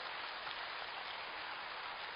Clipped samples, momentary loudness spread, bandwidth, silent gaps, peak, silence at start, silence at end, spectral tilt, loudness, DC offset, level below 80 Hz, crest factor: under 0.1%; 1 LU; 12.5 kHz; none; -28 dBFS; 0 s; 0 s; -3.5 dB/octave; -44 LUFS; under 0.1%; -76 dBFS; 18 dB